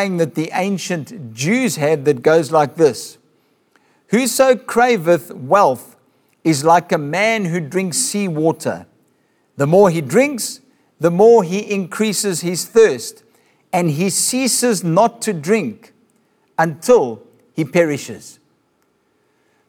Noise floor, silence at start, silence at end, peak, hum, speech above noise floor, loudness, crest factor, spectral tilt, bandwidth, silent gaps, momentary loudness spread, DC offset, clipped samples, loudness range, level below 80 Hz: -62 dBFS; 0 s; 1.35 s; -2 dBFS; none; 47 dB; -16 LUFS; 16 dB; -4.5 dB/octave; 19 kHz; none; 12 LU; under 0.1%; under 0.1%; 3 LU; -62 dBFS